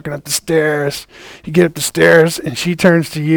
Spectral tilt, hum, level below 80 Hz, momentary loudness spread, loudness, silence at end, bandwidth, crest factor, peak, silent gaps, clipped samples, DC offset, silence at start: -4.5 dB/octave; none; -48 dBFS; 10 LU; -13 LUFS; 0 s; over 20 kHz; 14 dB; 0 dBFS; none; 0.2%; under 0.1%; 0.05 s